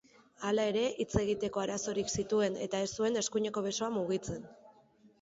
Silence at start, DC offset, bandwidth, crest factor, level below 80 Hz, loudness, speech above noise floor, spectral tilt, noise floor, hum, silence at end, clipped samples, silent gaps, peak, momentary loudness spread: 0.4 s; under 0.1%; 8 kHz; 20 dB; -58 dBFS; -33 LUFS; 31 dB; -4 dB/octave; -64 dBFS; none; 0.5 s; under 0.1%; none; -14 dBFS; 5 LU